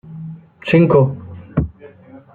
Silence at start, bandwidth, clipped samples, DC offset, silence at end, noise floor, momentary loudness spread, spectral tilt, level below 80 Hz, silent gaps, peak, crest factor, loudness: 0.1 s; 4.6 kHz; under 0.1%; under 0.1%; 0.15 s; -41 dBFS; 21 LU; -10 dB/octave; -38 dBFS; none; -2 dBFS; 16 dB; -16 LUFS